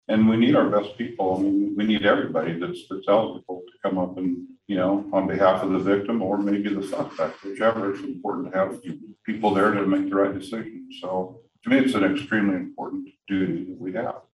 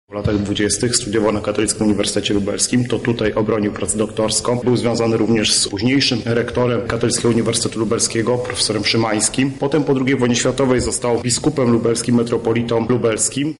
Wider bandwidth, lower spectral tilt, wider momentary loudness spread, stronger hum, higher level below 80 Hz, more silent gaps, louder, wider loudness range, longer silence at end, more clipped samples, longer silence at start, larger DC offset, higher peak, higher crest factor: about the same, 11.5 kHz vs 11.5 kHz; first, -7 dB/octave vs -4 dB/octave; first, 13 LU vs 3 LU; neither; second, -64 dBFS vs -42 dBFS; neither; second, -24 LUFS vs -17 LUFS; about the same, 2 LU vs 1 LU; about the same, 0.15 s vs 0.05 s; neither; about the same, 0.1 s vs 0.1 s; second, under 0.1% vs 0.2%; about the same, -4 dBFS vs -2 dBFS; about the same, 18 dB vs 16 dB